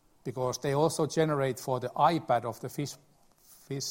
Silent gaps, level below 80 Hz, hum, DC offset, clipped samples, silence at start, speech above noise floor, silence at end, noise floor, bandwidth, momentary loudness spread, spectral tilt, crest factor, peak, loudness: none; -66 dBFS; none; under 0.1%; under 0.1%; 0.25 s; 30 dB; 0 s; -59 dBFS; 16.5 kHz; 12 LU; -5 dB/octave; 20 dB; -10 dBFS; -30 LUFS